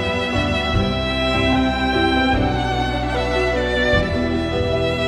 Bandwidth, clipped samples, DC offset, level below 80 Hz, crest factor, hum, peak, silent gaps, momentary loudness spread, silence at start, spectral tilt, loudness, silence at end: 12 kHz; under 0.1%; under 0.1%; -28 dBFS; 14 dB; none; -4 dBFS; none; 4 LU; 0 s; -6 dB/octave; -19 LUFS; 0 s